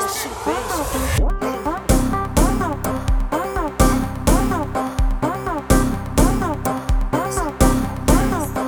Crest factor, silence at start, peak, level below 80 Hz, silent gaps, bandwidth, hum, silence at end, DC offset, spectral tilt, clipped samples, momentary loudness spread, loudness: 18 dB; 0 s; 0 dBFS; -22 dBFS; none; over 20 kHz; none; 0 s; under 0.1%; -5.5 dB/octave; under 0.1%; 5 LU; -20 LUFS